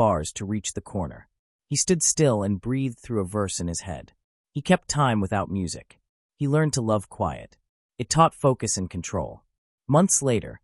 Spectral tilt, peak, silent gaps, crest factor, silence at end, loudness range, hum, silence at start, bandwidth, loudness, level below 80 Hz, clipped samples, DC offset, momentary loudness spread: -4.5 dB/octave; -6 dBFS; 1.39-1.59 s, 4.24-4.44 s, 6.09-6.29 s, 7.69-7.89 s, 9.58-9.78 s; 20 dB; 0.05 s; 2 LU; none; 0 s; 13.5 kHz; -24 LUFS; -50 dBFS; under 0.1%; under 0.1%; 14 LU